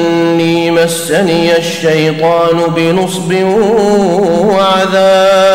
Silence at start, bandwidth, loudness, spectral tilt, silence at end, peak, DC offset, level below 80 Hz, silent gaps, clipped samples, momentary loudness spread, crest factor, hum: 0 s; 16.5 kHz; -10 LUFS; -5 dB/octave; 0 s; -2 dBFS; under 0.1%; -44 dBFS; none; under 0.1%; 4 LU; 8 dB; none